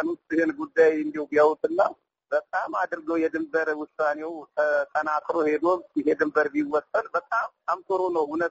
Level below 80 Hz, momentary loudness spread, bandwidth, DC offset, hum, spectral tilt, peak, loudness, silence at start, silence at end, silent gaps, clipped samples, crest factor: -70 dBFS; 7 LU; 7.8 kHz; under 0.1%; none; -3.5 dB/octave; -8 dBFS; -25 LUFS; 0 s; 0 s; none; under 0.1%; 16 dB